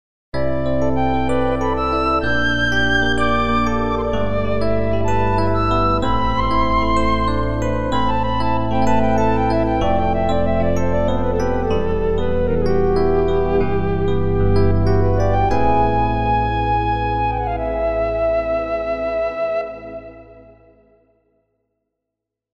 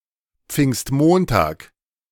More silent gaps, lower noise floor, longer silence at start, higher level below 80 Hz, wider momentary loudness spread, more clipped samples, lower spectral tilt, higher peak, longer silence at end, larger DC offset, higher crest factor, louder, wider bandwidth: neither; first, -82 dBFS vs -59 dBFS; second, 0.3 s vs 0.5 s; first, -28 dBFS vs -40 dBFS; second, 4 LU vs 10 LU; neither; about the same, -7 dB/octave vs -6 dB/octave; about the same, -4 dBFS vs -2 dBFS; second, 0 s vs 0.5 s; first, 6% vs under 0.1%; about the same, 14 dB vs 18 dB; about the same, -19 LUFS vs -18 LUFS; second, 9.4 kHz vs 18.5 kHz